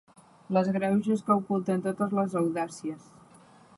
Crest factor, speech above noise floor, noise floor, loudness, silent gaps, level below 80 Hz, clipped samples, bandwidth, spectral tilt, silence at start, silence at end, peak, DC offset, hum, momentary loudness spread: 18 dB; 28 dB; -55 dBFS; -28 LUFS; none; -72 dBFS; under 0.1%; 11.5 kHz; -7.5 dB/octave; 0.5 s; 0.8 s; -10 dBFS; under 0.1%; none; 10 LU